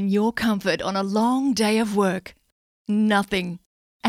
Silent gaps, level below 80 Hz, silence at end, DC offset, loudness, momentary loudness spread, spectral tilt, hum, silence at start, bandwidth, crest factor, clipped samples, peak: 2.52-2.85 s, 3.66-4.00 s; -56 dBFS; 0 s; under 0.1%; -22 LUFS; 10 LU; -5 dB/octave; none; 0 s; 15 kHz; 18 dB; under 0.1%; -6 dBFS